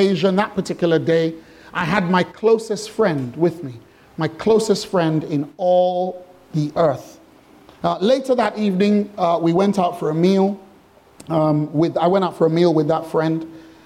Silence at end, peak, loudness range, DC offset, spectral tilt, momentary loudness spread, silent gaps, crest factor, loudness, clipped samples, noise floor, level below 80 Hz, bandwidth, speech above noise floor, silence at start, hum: 0.25 s; -2 dBFS; 2 LU; under 0.1%; -6.5 dB/octave; 9 LU; none; 16 dB; -19 LUFS; under 0.1%; -50 dBFS; -58 dBFS; 14.5 kHz; 32 dB; 0 s; none